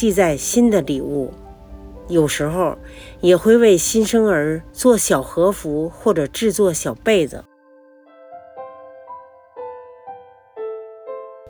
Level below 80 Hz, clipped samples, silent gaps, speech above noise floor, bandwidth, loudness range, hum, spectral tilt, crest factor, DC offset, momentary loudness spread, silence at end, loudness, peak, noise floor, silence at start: -44 dBFS; under 0.1%; none; 33 dB; over 20 kHz; 20 LU; none; -4.5 dB/octave; 16 dB; under 0.1%; 24 LU; 0 s; -17 LUFS; -2 dBFS; -49 dBFS; 0 s